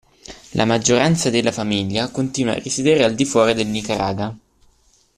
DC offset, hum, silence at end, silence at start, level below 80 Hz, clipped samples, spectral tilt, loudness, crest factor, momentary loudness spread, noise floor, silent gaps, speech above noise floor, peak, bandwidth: under 0.1%; none; 0.8 s; 0.3 s; -50 dBFS; under 0.1%; -4.5 dB/octave; -19 LUFS; 16 dB; 8 LU; -57 dBFS; none; 39 dB; -2 dBFS; 14.5 kHz